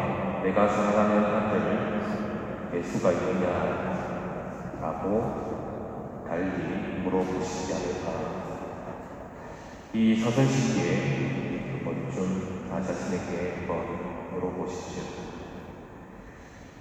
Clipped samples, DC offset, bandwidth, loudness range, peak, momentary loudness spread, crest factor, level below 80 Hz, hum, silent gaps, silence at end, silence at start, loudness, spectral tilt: under 0.1%; under 0.1%; 9 kHz; 6 LU; -10 dBFS; 17 LU; 18 dB; -52 dBFS; none; none; 0 s; 0 s; -29 LUFS; -6.5 dB/octave